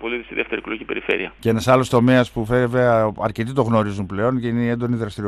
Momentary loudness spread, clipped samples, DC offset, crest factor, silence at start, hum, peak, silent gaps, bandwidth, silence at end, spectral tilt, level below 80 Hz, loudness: 9 LU; under 0.1%; under 0.1%; 16 dB; 0 s; none; -2 dBFS; none; 14 kHz; 0 s; -7 dB/octave; -46 dBFS; -20 LUFS